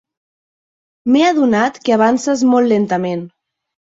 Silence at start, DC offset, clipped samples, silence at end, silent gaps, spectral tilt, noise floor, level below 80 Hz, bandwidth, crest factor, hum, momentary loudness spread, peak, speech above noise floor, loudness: 1.05 s; under 0.1%; under 0.1%; 0.7 s; none; -5.5 dB/octave; under -90 dBFS; -60 dBFS; 7.8 kHz; 14 dB; none; 9 LU; -2 dBFS; over 76 dB; -14 LUFS